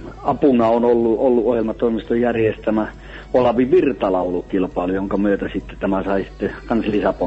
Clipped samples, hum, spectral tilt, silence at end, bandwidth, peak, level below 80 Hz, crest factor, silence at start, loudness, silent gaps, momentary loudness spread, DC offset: under 0.1%; none; -8.5 dB/octave; 0 s; 7.8 kHz; -4 dBFS; -40 dBFS; 14 dB; 0 s; -19 LUFS; none; 8 LU; under 0.1%